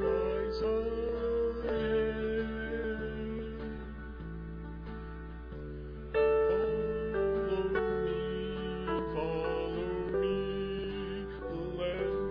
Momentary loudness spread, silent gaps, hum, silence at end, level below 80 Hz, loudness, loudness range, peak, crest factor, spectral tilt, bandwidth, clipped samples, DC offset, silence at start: 13 LU; none; none; 0 s; -46 dBFS; -34 LUFS; 7 LU; -18 dBFS; 14 dB; -5.5 dB/octave; 5.2 kHz; under 0.1%; under 0.1%; 0 s